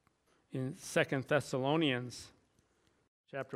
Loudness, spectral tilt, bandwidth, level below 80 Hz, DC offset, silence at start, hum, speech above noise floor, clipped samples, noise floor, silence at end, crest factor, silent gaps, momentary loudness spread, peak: -35 LUFS; -5 dB/octave; 15.5 kHz; -74 dBFS; under 0.1%; 0.5 s; none; 39 dB; under 0.1%; -73 dBFS; 0 s; 22 dB; 3.08-3.24 s; 15 LU; -14 dBFS